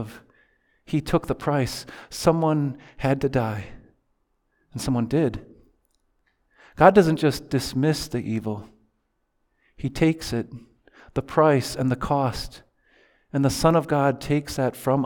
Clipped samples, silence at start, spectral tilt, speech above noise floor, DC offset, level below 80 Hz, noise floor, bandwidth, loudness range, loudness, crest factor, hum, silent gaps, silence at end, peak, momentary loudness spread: under 0.1%; 0 s; -6.5 dB/octave; 50 dB; under 0.1%; -46 dBFS; -72 dBFS; 19.5 kHz; 6 LU; -23 LUFS; 24 dB; none; none; 0 s; 0 dBFS; 15 LU